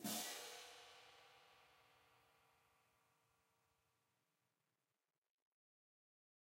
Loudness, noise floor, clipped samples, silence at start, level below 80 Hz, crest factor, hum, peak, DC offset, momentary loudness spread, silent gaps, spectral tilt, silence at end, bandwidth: -51 LUFS; under -90 dBFS; under 0.1%; 0 s; under -90 dBFS; 24 dB; none; -34 dBFS; under 0.1%; 22 LU; none; -1.5 dB/octave; 4 s; 16 kHz